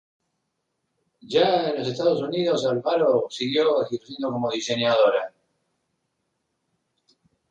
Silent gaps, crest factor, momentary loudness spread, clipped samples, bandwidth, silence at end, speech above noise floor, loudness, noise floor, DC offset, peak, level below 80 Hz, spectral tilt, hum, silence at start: none; 18 dB; 8 LU; under 0.1%; 9 kHz; 2.2 s; 55 dB; -23 LUFS; -77 dBFS; under 0.1%; -8 dBFS; -70 dBFS; -5 dB/octave; none; 1.25 s